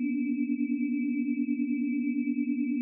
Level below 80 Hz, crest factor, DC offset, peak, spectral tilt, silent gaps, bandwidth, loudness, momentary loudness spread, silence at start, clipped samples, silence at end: under -90 dBFS; 10 dB; under 0.1%; -20 dBFS; -8 dB/octave; none; 2.8 kHz; -30 LUFS; 0 LU; 0 s; under 0.1%; 0 s